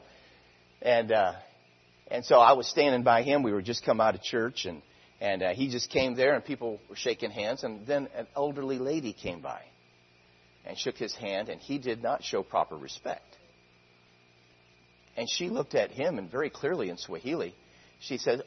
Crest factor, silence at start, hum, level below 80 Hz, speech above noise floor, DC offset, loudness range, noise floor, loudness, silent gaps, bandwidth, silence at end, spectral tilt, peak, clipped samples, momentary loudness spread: 24 dB; 0.8 s; none; -68 dBFS; 33 dB; under 0.1%; 11 LU; -62 dBFS; -29 LUFS; none; 6.4 kHz; 0 s; -4.5 dB/octave; -6 dBFS; under 0.1%; 14 LU